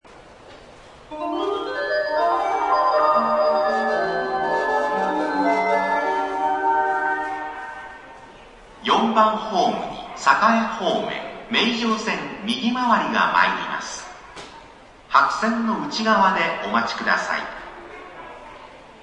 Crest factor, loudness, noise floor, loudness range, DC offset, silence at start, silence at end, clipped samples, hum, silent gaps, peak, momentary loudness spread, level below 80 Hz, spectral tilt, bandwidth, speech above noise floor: 22 dB; -21 LUFS; -46 dBFS; 3 LU; under 0.1%; 0.1 s; 0 s; under 0.1%; none; none; 0 dBFS; 20 LU; -56 dBFS; -4 dB/octave; 10.5 kHz; 25 dB